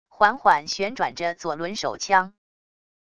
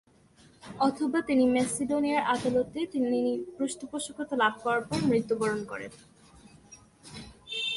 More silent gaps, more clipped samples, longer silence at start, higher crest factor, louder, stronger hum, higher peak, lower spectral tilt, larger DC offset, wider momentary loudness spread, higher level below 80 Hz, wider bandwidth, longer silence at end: neither; neither; second, 0.2 s vs 0.65 s; about the same, 22 dB vs 18 dB; first, -23 LUFS vs -28 LUFS; neither; first, -2 dBFS vs -12 dBFS; second, -2.5 dB/octave vs -4.5 dB/octave; first, 0.3% vs under 0.1%; second, 9 LU vs 15 LU; about the same, -62 dBFS vs -62 dBFS; about the same, 11 kHz vs 11.5 kHz; first, 0.8 s vs 0 s